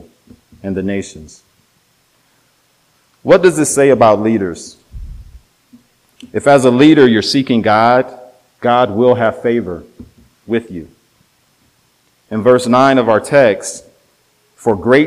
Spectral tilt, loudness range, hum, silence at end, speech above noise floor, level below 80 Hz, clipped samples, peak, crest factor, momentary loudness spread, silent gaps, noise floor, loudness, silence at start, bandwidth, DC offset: -5 dB/octave; 7 LU; none; 0 s; 45 dB; -44 dBFS; 0.2%; 0 dBFS; 14 dB; 20 LU; none; -57 dBFS; -12 LUFS; 0.65 s; 15.5 kHz; under 0.1%